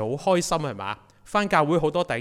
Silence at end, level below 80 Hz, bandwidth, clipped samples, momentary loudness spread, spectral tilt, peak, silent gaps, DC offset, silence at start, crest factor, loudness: 0 s; -52 dBFS; 16 kHz; under 0.1%; 12 LU; -5 dB/octave; -6 dBFS; none; under 0.1%; 0 s; 18 dB; -24 LUFS